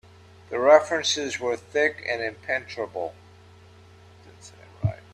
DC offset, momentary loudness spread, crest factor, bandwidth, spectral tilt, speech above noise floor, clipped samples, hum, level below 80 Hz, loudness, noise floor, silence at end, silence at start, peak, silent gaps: under 0.1%; 15 LU; 24 dB; 11 kHz; -3.5 dB/octave; 27 dB; under 0.1%; none; -58 dBFS; -24 LUFS; -50 dBFS; 0.2 s; 0.5 s; -4 dBFS; none